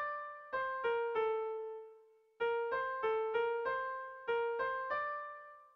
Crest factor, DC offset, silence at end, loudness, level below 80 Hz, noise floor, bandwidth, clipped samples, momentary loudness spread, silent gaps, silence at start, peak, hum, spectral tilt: 14 dB; under 0.1%; 0.1 s; -37 LUFS; -76 dBFS; -63 dBFS; 5.4 kHz; under 0.1%; 9 LU; none; 0 s; -24 dBFS; none; -4.5 dB/octave